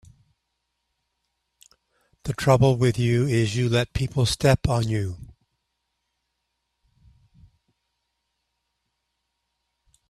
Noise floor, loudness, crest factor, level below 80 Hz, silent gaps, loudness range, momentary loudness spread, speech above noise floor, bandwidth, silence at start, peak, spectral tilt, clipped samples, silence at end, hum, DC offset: -78 dBFS; -22 LUFS; 22 dB; -44 dBFS; none; 8 LU; 13 LU; 57 dB; 13.5 kHz; 2.25 s; -4 dBFS; -6 dB/octave; under 0.1%; 4.85 s; none; under 0.1%